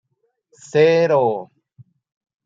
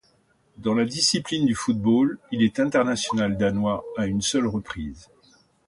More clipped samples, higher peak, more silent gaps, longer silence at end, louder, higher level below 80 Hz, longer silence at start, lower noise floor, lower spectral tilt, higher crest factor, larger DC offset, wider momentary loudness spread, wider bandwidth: neither; first, -4 dBFS vs -8 dBFS; neither; first, 1 s vs 0.65 s; first, -17 LUFS vs -23 LUFS; second, -72 dBFS vs -50 dBFS; first, 0.75 s vs 0.6 s; first, -69 dBFS vs -63 dBFS; first, -6 dB/octave vs -4.5 dB/octave; about the same, 16 dB vs 16 dB; neither; about the same, 9 LU vs 8 LU; second, 7.8 kHz vs 11.5 kHz